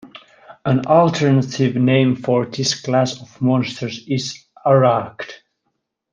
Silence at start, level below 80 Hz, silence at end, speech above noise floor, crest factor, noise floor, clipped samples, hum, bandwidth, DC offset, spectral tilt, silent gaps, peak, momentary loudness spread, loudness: 0.05 s; -60 dBFS; 0.75 s; 56 dB; 16 dB; -73 dBFS; under 0.1%; none; 9.2 kHz; under 0.1%; -6 dB/octave; none; -2 dBFS; 13 LU; -18 LUFS